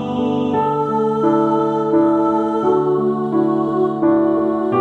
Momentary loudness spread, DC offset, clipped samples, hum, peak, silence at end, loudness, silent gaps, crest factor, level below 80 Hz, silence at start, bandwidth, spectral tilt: 3 LU; under 0.1%; under 0.1%; none; -4 dBFS; 0 s; -17 LUFS; none; 12 dB; -58 dBFS; 0 s; 6.4 kHz; -9 dB/octave